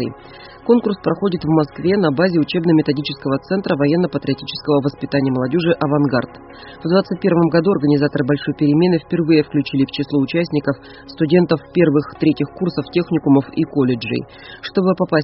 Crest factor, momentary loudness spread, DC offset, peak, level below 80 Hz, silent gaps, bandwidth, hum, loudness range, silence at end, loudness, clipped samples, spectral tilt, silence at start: 16 dB; 8 LU; under 0.1%; -2 dBFS; -50 dBFS; none; 5.8 kHz; none; 2 LU; 0 s; -17 LUFS; under 0.1%; -6 dB/octave; 0 s